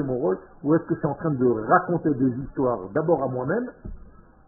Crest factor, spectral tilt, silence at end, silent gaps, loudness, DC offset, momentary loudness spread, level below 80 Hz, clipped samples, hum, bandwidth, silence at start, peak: 20 dB; -4.5 dB/octave; 0.45 s; none; -24 LUFS; under 0.1%; 8 LU; -48 dBFS; under 0.1%; none; 2.1 kHz; 0 s; -4 dBFS